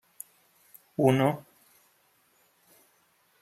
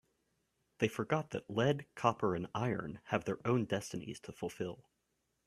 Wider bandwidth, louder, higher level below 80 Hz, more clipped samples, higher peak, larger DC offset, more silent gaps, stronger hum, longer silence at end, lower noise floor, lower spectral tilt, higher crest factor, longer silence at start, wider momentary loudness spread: first, 15.5 kHz vs 14 kHz; first, -27 LUFS vs -37 LUFS; about the same, -72 dBFS vs -70 dBFS; neither; first, -8 dBFS vs -14 dBFS; neither; neither; neither; first, 2 s vs 0.7 s; second, -67 dBFS vs -82 dBFS; about the same, -7 dB/octave vs -6 dB/octave; about the same, 24 dB vs 24 dB; first, 1 s vs 0.8 s; first, 23 LU vs 10 LU